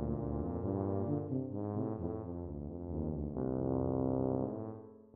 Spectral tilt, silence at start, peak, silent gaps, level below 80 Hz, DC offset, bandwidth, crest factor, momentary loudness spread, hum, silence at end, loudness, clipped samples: -14 dB/octave; 0 s; -20 dBFS; none; -52 dBFS; under 0.1%; 2.2 kHz; 16 dB; 9 LU; none; 0.05 s; -38 LUFS; under 0.1%